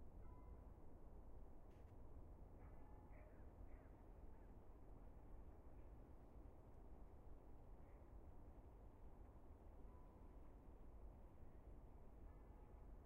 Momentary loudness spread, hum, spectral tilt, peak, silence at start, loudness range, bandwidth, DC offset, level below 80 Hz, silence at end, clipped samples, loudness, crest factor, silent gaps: 2 LU; none; -7.5 dB/octave; -48 dBFS; 0 s; 1 LU; 3.2 kHz; under 0.1%; -62 dBFS; 0 s; under 0.1%; -66 LUFS; 14 dB; none